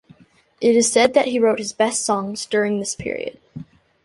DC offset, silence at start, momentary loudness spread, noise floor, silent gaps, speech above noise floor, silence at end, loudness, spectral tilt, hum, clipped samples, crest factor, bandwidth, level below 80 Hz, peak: under 0.1%; 0.6 s; 16 LU; -51 dBFS; none; 32 dB; 0.4 s; -19 LUFS; -3 dB/octave; none; under 0.1%; 18 dB; 11.5 kHz; -58 dBFS; -2 dBFS